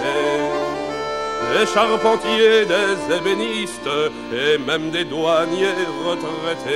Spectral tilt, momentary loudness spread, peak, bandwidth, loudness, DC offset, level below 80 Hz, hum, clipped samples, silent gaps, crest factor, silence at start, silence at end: -3.5 dB/octave; 8 LU; -2 dBFS; 13.5 kHz; -19 LUFS; 0.3%; -54 dBFS; none; under 0.1%; none; 18 dB; 0 s; 0 s